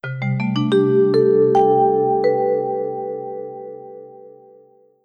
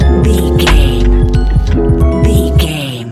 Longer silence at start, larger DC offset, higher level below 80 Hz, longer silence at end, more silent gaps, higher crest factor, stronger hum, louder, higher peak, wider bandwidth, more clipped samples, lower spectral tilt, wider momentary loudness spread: about the same, 0.05 s vs 0 s; neither; second, -68 dBFS vs -12 dBFS; first, 0.75 s vs 0 s; neither; first, 14 dB vs 8 dB; neither; second, -17 LUFS vs -11 LUFS; second, -4 dBFS vs 0 dBFS; second, 8.6 kHz vs 14.5 kHz; second, under 0.1% vs 0.3%; first, -8.5 dB/octave vs -6.5 dB/octave; first, 20 LU vs 3 LU